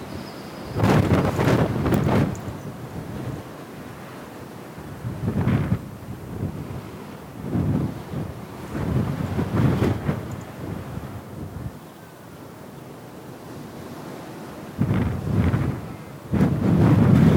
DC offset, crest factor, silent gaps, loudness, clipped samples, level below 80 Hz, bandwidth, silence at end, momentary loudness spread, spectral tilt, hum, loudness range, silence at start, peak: under 0.1%; 20 dB; none; -24 LUFS; under 0.1%; -40 dBFS; 17.5 kHz; 0 s; 18 LU; -8 dB/octave; none; 14 LU; 0 s; -4 dBFS